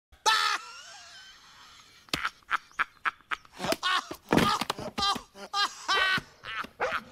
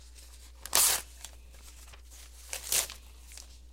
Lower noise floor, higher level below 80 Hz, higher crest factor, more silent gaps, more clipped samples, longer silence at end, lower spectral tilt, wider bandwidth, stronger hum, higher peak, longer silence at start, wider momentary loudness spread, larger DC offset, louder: about the same, -54 dBFS vs -51 dBFS; second, -58 dBFS vs -52 dBFS; second, 24 dB vs 32 dB; neither; neither; about the same, 0 s vs 0 s; first, -2.5 dB/octave vs 1 dB/octave; about the same, 16 kHz vs 16.5 kHz; neither; second, -8 dBFS vs -4 dBFS; first, 0.25 s vs 0 s; second, 18 LU vs 27 LU; neither; about the same, -29 LUFS vs -28 LUFS